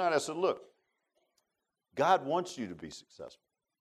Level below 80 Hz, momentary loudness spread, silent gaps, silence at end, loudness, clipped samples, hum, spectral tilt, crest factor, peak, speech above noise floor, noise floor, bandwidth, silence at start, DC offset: -76 dBFS; 21 LU; none; 0.5 s; -32 LUFS; under 0.1%; none; -4 dB/octave; 22 dB; -14 dBFS; 53 dB; -86 dBFS; 13.5 kHz; 0 s; under 0.1%